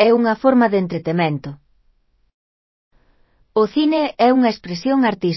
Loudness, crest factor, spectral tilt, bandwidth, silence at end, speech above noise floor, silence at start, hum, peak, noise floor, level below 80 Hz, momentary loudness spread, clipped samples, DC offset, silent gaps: -17 LUFS; 18 dB; -7.5 dB/octave; 6 kHz; 0 s; 43 dB; 0 s; none; 0 dBFS; -60 dBFS; -58 dBFS; 9 LU; under 0.1%; under 0.1%; 2.34-2.91 s